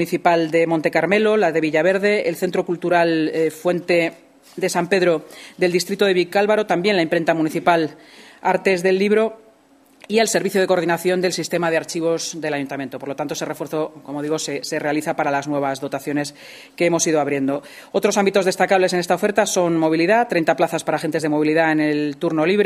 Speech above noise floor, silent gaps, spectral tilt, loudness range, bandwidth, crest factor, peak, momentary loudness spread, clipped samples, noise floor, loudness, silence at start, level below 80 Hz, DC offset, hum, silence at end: 34 dB; none; -4.5 dB/octave; 6 LU; 15.5 kHz; 18 dB; 0 dBFS; 9 LU; under 0.1%; -53 dBFS; -19 LUFS; 0 s; -68 dBFS; under 0.1%; none; 0 s